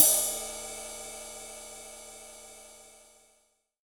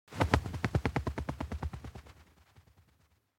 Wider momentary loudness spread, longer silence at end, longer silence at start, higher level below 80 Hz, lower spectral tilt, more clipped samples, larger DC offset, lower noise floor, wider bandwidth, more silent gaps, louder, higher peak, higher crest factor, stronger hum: first, 21 LU vs 17 LU; second, 1 s vs 1.15 s; about the same, 0 s vs 0.1 s; second, -60 dBFS vs -44 dBFS; second, 1 dB/octave vs -6.5 dB/octave; neither; neither; about the same, -71 dBFS vs -70 dBFS; first, over 20 kHz vs 16.5 kHz; neither; first, -31 LUFS vs -35 LUFS; first, -2 dBFS vs -6 dBFS; about the same, 30 dB vs 30 dB; neither